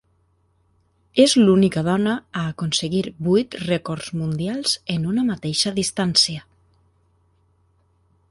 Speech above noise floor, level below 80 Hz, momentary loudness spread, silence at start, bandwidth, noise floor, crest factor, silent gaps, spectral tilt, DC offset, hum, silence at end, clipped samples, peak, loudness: 43 dB; -54 dBFS; 10 LU; 1.15 s; 11.5 kHz; -63 dBFS; 20 dB; none; -4.5 dB/octave; under 0.1%; none; 1.9 s; under 0.1%; -2 dBFS; -20 LUFS